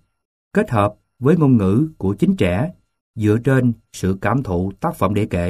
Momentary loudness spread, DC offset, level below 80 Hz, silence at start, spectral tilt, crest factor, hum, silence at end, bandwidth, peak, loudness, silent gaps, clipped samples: 8 LU; under 0.1%; -44 dBFS; 0.55 s; -8 dB/octave; 16 dB; none; 0 s; 14.5 kHz; -2 dBFS; -19 LUFS; 3.01-3.14 s; under 0.1%